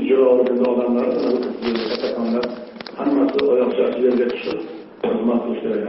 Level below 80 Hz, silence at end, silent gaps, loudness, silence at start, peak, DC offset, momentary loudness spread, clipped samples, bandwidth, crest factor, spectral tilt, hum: -60 dBFS; 0 s; none; -20 LUFS; 0 s; -4 dBFS; under 0.1%; 11 LU; under 0.1%; 6 kHz; 16 dB; -4 dB/octave; none